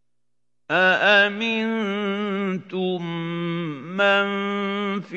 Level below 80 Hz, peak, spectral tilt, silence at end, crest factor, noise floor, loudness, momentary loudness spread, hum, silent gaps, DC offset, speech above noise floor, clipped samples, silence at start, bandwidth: -84 dBFS; -4 dBFS; -6 dB/octave; 0 s; 20 dB; -82 dBFS; -22 LUFS; 11 LU; none; none; under 0.1%; 60 dB; under 0.1%; 0.7 s; 7.8 kHz